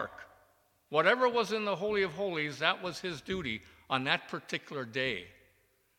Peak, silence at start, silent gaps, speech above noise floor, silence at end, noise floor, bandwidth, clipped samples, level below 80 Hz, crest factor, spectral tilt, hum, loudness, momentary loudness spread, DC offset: -10 dBFS; 0 s; none; 38 dB; 0.7 s; -70 dBFS; 16.5 kHz; under 0.1%; -66 dBFS; 24 dB; -4.5 dB/octave; none; -32 LUFS; 11 LU; under 0.1%